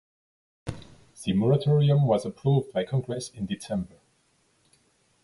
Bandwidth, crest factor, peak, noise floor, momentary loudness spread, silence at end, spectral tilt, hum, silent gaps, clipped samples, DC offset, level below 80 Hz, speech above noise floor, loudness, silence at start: 11.5 kHz; 16 dB; -10 dBFS; -67 dBFS; 18 LU; 1.35 s; -7.5 dB/octave; none; none; under 0.1%; under 0.1%; -56 dBFS; 43 dB; -26 LUFS; 0.65 s